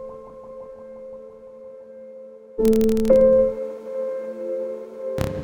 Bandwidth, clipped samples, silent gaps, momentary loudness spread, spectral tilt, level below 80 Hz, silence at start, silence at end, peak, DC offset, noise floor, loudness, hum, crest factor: over 20 kHz; under 0.1%; none; 25 LU; -7.5 dB/octave; -42 dBFS; 0 s; 0 s; -4 dBFS; under 0.1%; -41 dBFS; -21 LUFS; none; 18 dB